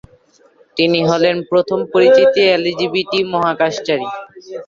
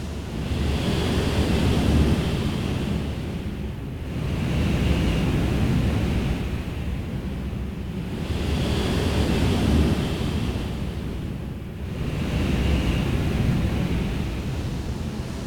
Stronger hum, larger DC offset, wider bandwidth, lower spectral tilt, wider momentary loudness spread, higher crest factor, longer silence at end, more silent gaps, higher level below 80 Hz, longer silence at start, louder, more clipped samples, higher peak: neither; neither; second, 7.4 kHz vs 18 kHz; second, -5 dB/octave vs -6.5 dB/octave; first, 12 LU vs 9 LU; about the same, 14 dB vs 16 dB; about the same, 0.05 s vs 0 s; neither; second, -58 dBFS vs -30 dBFS; first, 0.75 s vs 0 s; first, -14 LUFS vs -25 LUFS; neither; first, -2 dBFS vs -8 dBFS